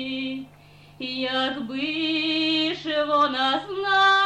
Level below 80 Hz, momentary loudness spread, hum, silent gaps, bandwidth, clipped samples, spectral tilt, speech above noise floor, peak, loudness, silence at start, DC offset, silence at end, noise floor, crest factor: -62 dBFS; 11 LU; 50 Hz at -70 dBFS; none; 9.6 kHz; under 0.1%; -3.5 dB/octave; 26 dB; -10 dBFS; -23 LUFS; 0 s; under 0.1%; 0 s; -50 dBFS; 14 dB